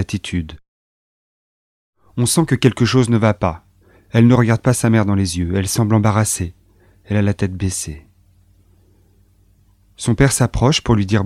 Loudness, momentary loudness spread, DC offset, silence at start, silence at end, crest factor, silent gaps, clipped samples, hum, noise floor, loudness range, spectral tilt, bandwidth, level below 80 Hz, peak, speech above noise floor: -16 LUFS; 11 LU; under 0.1%; 0 s; 0 s; 18 dB; 0.68-1.93 s; under 0.1%; 50 Hz at -40 dBFS; -54 dBFS; 9 LU; -5.5 dB/octave; 14.5 kHz; -38 dBFS; 0 dBFS; 38 dB